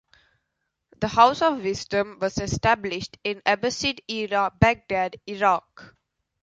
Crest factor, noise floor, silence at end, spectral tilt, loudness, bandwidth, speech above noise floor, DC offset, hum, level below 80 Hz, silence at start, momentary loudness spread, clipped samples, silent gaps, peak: 22 dB; -79 dBFS; 0.6 s; -4.5 dB/octave; -23 LUFS; 9.2 kHz; 55 dB; under 0.1%; none; -46 dBFS; 1 s; 11 LU; under 0.1%; none; -2 dBFS